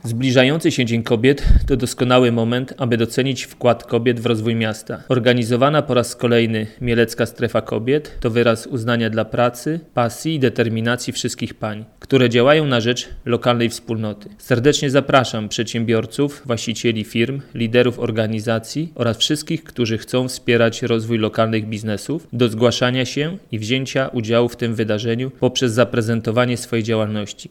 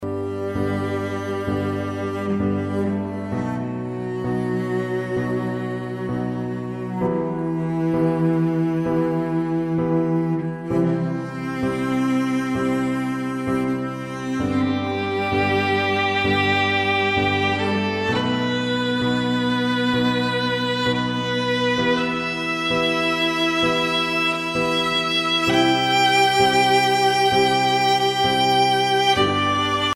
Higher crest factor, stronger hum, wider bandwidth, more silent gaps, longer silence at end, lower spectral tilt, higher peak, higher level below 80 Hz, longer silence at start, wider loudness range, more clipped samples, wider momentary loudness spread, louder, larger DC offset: about the same, 16 dB vs 16 dB; neither; about the same, 16.5 kHz vs 16.5 kHz; neither; about the same, 0.05 s vs 0 s; about the same, -5.5 dB/octave vs -5 dB/octave; about the same, -2 dBFS vs -4 dBFS; first, -34 dBFS vs -50 dBFS; about the same, 0.05 s vs 0 s; second, 2 LU vs 8 LU; neither; about the same, 8 LU vs 9 LU; about the same, -19 LUFS vs -21 LUFS; neither